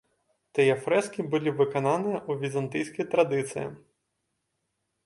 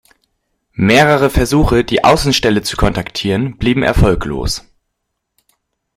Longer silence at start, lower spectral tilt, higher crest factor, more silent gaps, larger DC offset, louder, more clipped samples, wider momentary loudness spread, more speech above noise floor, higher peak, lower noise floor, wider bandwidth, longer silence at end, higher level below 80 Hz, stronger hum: second, 0.55 s vs 0.8 s; about the same, -6 dB/octave vs -5 dB/octave; first, 20 dB vs 14 dB; neither; neither; second, -27 LUFS vs -13 LUFS; neither; about the same, 8 LU vs 9 LU; second, 53 dB vs 60 dB; second, -8 dBFS vs 0 dBFS; first, -79 dBFS vs -73 dBFS; second, 11.5 kHz vs 16.5 kHz; about the same, 1.3 s vs 1.35 s; second, -72 dBFS vs -26 dBFS; neither